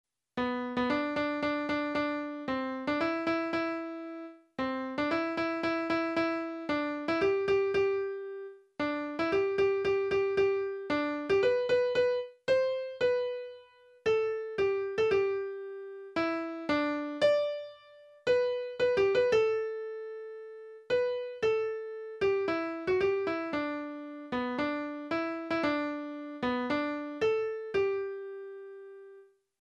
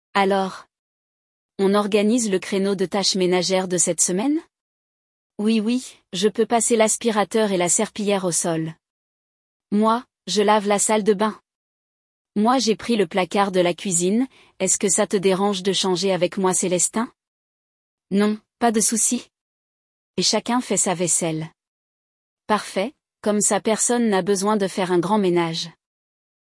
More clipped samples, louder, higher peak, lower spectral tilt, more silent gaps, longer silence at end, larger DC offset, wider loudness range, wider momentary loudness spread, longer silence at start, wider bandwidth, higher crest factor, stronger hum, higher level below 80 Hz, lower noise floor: neither; second, -31 LUFS vs -20 LUFS; second, -16 dBFS vs -4 dBFS; first, -5.5 dB/octave vs -3.5 dB/octave; second, none vs 0.79-1.49 s, 4.61-5.30 s, 8.90-9.60 s, 11.55-12.25 s, 17.28-17.98 s, 19.41-20.14 s, 21.67-22.37 s; second, 0.4 s vs 0.85 s; neither; about the same, 4 LU vs 3 LU; first, 14 LU vs 8 LU; first, 0.35 s vs 0.15 s; second, 8.6 kHz vs 12 kHz; about the same, 16 dB vs 18 dB; neither; about the same, -64 dBFS vs -66 dBFS; second, -56 dBFS vs under -90 dBFS